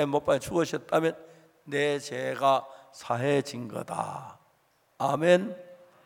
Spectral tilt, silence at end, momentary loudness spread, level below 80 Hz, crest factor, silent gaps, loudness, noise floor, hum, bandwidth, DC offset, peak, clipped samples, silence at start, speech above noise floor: -5.5 dB/octave; 0.3 s; 18 LU; -66 dBFS; 20 dB; none; -28 LUFS; -67 dBFS; none; 17 kHz; under 0.1%; -8 dBFS; under 0.1%; 0 s; 40 dB